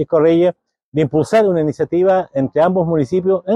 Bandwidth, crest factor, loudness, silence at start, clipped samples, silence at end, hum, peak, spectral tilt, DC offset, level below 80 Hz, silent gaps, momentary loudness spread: 11 kHz; 12 dB; -16 LUFS; 0 s; under 0.1%; 0 s; none; -4 dBFS; -8 dB/octave; under 0.1%; -52 dBFS; 0.83-0.92 s; 5 LU